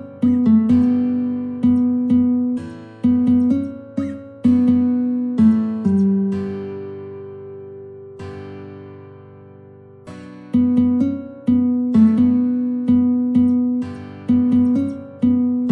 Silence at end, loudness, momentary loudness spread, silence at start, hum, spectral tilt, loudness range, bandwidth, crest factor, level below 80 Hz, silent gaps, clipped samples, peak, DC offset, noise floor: 0 s; -18 LUFS; 20 LU; 0 s; 50 Hz at -60 dBFS; -10 dB/octave; 13 LU; 4.1 kHz; 14 dB; -54 dBFS; none; under 0.1%; -4 dBFS; under 0.1%; -42 dBFS